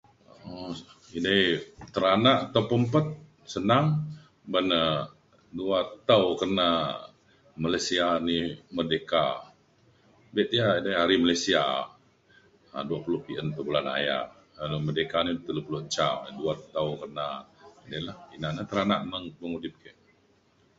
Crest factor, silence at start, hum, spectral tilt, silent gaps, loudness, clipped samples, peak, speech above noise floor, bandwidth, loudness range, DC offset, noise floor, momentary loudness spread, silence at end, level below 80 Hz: 22 dB; 0.45 s; none; -5 dB/octave; none; -27 LUFS; under 0.1%; -6 dBFS; 37 dB; 8 kHz; 7 LU; under 0.1%; -64 dBFS; 16 LU; 0.9 s; -58 dBFS